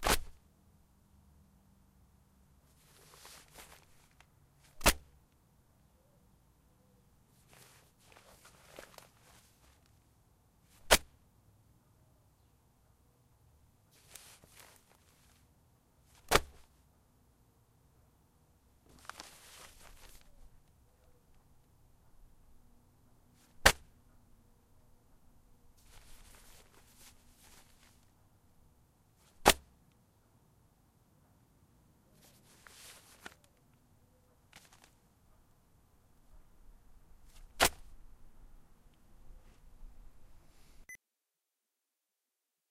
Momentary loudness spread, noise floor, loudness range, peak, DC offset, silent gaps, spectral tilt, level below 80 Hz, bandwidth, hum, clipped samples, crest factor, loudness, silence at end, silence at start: 32 LU; -88 dBFS; 24 LU; -4 dBFS; under 0.1%; none; -2 dB/octave; -52 dBFS; 15.5 kHz; none; under 0.1%; 38 dB; -31 LUFS; 1.75 s; 0 s